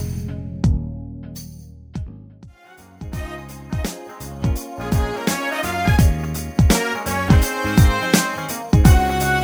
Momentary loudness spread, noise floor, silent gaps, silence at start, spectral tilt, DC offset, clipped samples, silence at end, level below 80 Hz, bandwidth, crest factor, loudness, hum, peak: 18 LU; -46 dBFS; none; 0 s; -5.5 dB/octave; under 0.1%; under 0.1%; 0 s; -24 dBFS; over 20 kHz; 18 dB; -19 LUFS; none; 0 dBFS